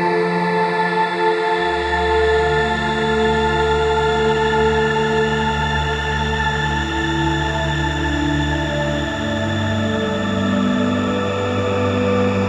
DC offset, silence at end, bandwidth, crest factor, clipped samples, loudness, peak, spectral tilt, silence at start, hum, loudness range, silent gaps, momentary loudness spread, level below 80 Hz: under 0.1%; 0 s; 11.5 kHz; 14 dB; under 0.1%; -18 LUFS; -4 dBFS; -5.5 dB/octave; 0 s; none; 3 LU; none; 4 LU; -30 dBFS